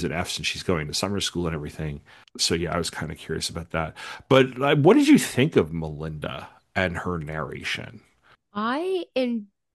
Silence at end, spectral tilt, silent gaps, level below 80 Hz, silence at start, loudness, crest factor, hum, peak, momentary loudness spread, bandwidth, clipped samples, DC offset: 0.3 s; -5 dB/octave; none; -50 dBFS; 0 s; -24 LUFS; 20 dB; none; -4 dBFS; 15 LU; 12.5 kHz; under 0.1%; under 0.1%